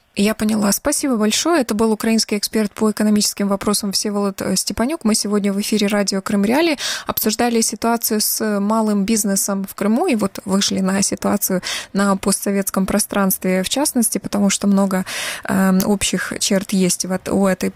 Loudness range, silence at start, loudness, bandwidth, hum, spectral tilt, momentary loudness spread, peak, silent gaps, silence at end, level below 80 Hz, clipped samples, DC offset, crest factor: 1 LU; 0.15 s; -18 LUFS; 16.5 kHz; none; -4 dB/octave; 4 LU; -2 dBFS; none; 0.05 s; -48 dBFS; under 0.1%; under 0.1%; 16 dB